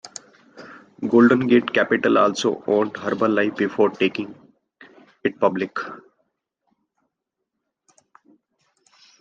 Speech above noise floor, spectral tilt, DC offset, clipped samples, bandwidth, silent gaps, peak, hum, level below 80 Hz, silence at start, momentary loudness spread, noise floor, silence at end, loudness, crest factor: 61 dB; -5.5 dB/octave; under 0.1%; under 0.1%; 9.2 kHz; none; -4 dBFS; none; -68 dBFS; 0.05 s; 16 LU; -81 dBFS; 3.25 s; -20 LUFS; 20 dB